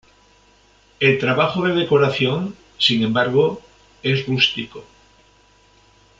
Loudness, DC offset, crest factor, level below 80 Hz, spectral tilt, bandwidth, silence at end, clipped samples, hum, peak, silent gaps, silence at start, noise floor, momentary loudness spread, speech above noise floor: -18 LUFS; under 0.1%; 18 dB; -56 dBFS; -6 dB/octave; 7.8 kHz; 1.35 s; under 0.1%; none; -2 dBFS; none; 1 s; -54 dBFS; 11 LU; 36 dB